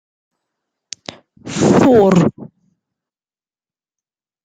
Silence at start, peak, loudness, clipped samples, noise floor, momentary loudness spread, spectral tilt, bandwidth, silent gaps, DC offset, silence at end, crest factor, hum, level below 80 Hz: 1.45 s; -2 dBFS; -12 LUFS; under 0.1%; under -90 dBFS; 23 LU; -6.5 dB/octave; 15 kHz; none; under 0.1%; 2 s; 16 dB; none; -52 dBFS